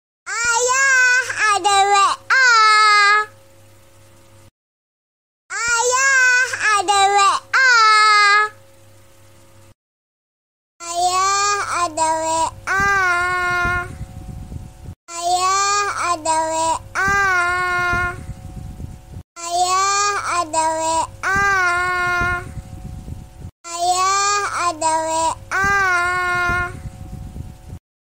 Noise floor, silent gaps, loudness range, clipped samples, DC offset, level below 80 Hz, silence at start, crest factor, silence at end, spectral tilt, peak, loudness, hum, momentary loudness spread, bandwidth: -49 dBFS; 4.51-5.49 s, 9.75-10.80 s, 14.96-15.07 s, 19.24-19.36 s, 23.52-23.64 s; 7 LU; under 0.1%; 0.3%; -42 dBFS; 0.25 s; 16 dB; 0.3 s; -1.5 dB/octave; -2 dBFS; -16 LUFS; none; 23 LU; 16 kHz